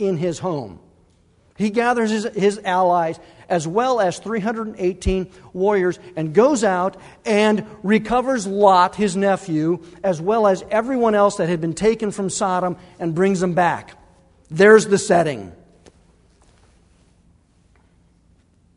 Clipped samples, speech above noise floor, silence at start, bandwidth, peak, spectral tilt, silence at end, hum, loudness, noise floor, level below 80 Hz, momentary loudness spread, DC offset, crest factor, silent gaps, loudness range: under 0.1%; 38 dB; 0 s; 11 kHz; 0 dBFS; -5.5 dB/octave; 3.2 s; none; -19 LUFS; -57 dBFS; -44 dBFS; 10 LU; under 0.1%; 20 dB; none; 3 LU